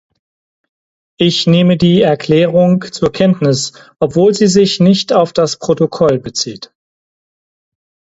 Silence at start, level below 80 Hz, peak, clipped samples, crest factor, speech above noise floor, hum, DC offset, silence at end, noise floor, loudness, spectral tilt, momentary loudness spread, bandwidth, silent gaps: 1.2 s; -48 dBFS; 0 dBFS; under 0.1%; 12 dB; over 79 dB; none; under 0.1%; 1.45 s; under -90 dBFS; -12 LUFS; -5.5 dB/octave; 8 LU; 8 kHz; none